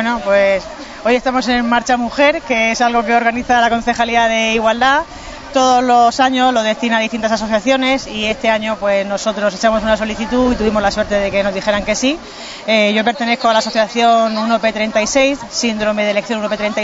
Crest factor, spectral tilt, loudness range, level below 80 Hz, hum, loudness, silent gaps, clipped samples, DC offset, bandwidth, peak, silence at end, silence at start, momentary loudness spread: 14 dB; -3.5 dB/octave; 2 LU; -40 dBFS; none; -14 LUFS; none; under 0.1%; under 0.1%; 7.8 kHz; -2 dBFS; 0 s; 0 s; 6 LU